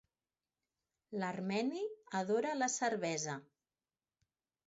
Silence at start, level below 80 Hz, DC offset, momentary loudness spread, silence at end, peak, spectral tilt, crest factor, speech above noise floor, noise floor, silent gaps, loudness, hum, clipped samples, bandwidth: 1.1 s; -86 dBFS; under 0.1%; 8 LU; 1.25 s; -24 dBFS; -4 dB/octave; 16 dB; over 53 dB; under -90 dBFS; none; -38 LUFS; none; under 0.1%; 7.6 kHz